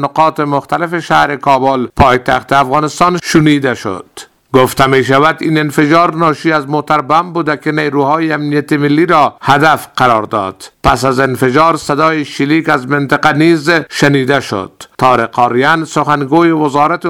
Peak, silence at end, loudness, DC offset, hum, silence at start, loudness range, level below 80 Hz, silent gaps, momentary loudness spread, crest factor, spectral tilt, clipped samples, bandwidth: 0 dBFS; 0 s; -11 LUFS; 0.3%; none; 0 s; 1 LU; -36 dBFS; none; 6 LU; 10 dB; -5.5 dB/octave; 0.4%; 17 kHz